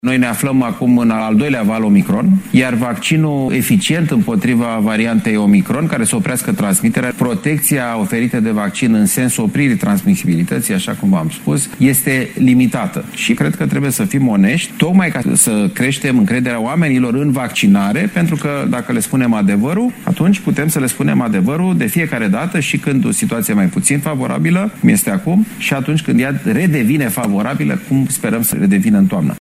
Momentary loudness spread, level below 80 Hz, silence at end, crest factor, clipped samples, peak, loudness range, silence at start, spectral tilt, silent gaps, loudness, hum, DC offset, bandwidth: 4 LU; -50 dBFS; 0 s; 14 dB; under 0.1%; 0 dBFS; 1 LU; 0.05 s; -5 dB/octave; none; -14 LUFS; none; under 0.1%; 16 kHz